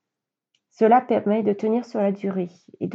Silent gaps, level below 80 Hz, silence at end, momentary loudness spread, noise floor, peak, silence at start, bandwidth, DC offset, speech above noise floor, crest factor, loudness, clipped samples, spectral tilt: none; -84 dBFS; 0 s; 12 LU; -86 dBFS; -6 dBFS; 0.8 s; 7.4 kHz; under 0.1%; 64 dB; 18 dB; -22 LUFS; under 0.1%; -8.5 dB/octave